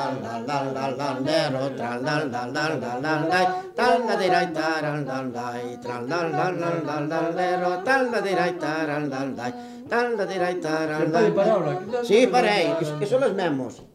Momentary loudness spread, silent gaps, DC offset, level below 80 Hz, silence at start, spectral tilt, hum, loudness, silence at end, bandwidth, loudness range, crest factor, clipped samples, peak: 9 LU; none; under 0.1%; -66 dBFS; 0 s; -5.5 dB/octave; none; -24 LUFS; 0.1 s; 15 kHz; 4 LU; 18 dB; under 0.1%; -6 dBFS